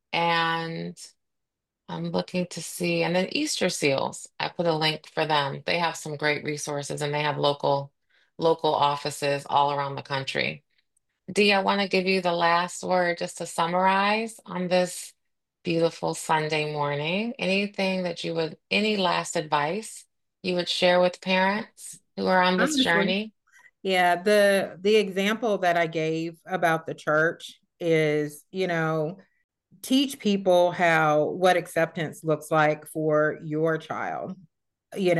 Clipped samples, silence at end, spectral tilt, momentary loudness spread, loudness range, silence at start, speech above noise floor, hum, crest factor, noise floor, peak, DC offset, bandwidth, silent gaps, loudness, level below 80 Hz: under 0.1%; 0 s; -4.5 dB/octave; 11 LU; 4 LU; 0.1 s; 60 dB; none; 18 dB; -84 dBFS; -6 dBFS; under 0.1%; 12.5 kHz; 29.44-29.49 s; -25 LUFS; -72 dBFS